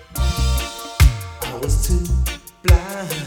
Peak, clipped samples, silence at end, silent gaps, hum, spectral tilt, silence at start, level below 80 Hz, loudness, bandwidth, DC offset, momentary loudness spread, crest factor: 0 dBFS; under 0.1%; 0 s; none; none; -4.5 dB/octave; 0 s; -20 dBFS; -20 LUFS; 19 kHz; under 0.1%; 9 LU; 18 dB